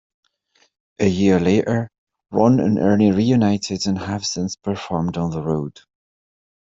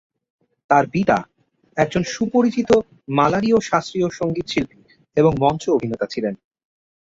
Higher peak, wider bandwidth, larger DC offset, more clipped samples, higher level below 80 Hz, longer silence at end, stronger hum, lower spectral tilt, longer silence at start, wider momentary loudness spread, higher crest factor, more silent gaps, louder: about the same, -4 dBFS vs -2 dBFS; about the same, 7.8 kHz vs 7.8 kHz; neither; neither; about the same, -54 dBFS vs -50 dBFS; first, 1 s vs 0.85 s; neither; about the same, -6.5 dB/octave vs -6 dB/octave; first, 1 s vs 0.7 s; about the same, 9 LU vs 8 LU; about the same, 16 dB vs 18 dB; first, 1.98-2.07 s vs none; about the same, -19 LUFS vs -20 LUFS